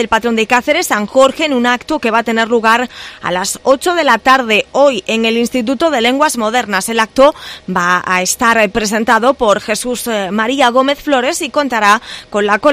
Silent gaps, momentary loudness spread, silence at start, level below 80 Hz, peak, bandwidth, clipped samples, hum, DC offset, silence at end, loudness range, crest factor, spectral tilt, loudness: none; 6 LU; 0 s; -44 dBFS; 0 dBFS; 16 kHz; 0.3%; none; under 0.1%; 0 s; 1 LU; 12 dB; -3 dB/octave; -12 LUFS